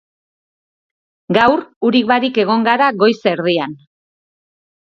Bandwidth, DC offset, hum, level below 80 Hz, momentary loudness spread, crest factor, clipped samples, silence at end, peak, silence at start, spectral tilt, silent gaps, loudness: 7.2 kHz; under 0.1%; none; -58 dBFS; 5 LU; 16 dB; under 0.1%; 1.15 s; 0 dBFS; 1.3 s; -6.5 dB/octave; 1.76-1.81 s; -14 LUFS